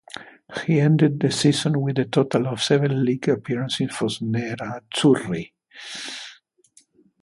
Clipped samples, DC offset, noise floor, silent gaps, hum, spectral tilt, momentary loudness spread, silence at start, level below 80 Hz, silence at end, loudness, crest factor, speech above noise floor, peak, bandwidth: under 0.1%; under 0.1%; -58 dBFS; none; none; -6 dB/octave; 16 LU; 0.15 s; -62 dBFS; 0.9 s; -22 LUFS; 18 dB; 37 dB; -4 dBFS; 11.5 kHz